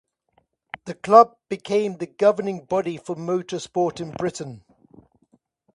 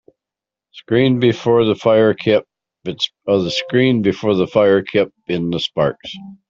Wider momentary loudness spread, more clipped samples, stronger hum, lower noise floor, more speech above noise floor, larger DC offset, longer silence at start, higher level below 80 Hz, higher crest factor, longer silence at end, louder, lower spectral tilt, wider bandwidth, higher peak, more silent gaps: first, 21 LU vs 8 LU; neither; neither; second, -67 dBFS vs -87 dBFS; second, 45 dB vs 71 dB; neither; about the same, 0.85 s vs 0.75 s; second, -64 dBFS vs -54 dBFS; first, 22 dB vs 16 dB; first, 1.15 s vs 0.15 s; second, -22 LUFS vs -16 LUFS; about the same, -6 dB/octave vs -6.5 dB/octave; first, 11 kHz vs 7.6 kHz; about the same, 0 dBFS vs -2 dBFS; neither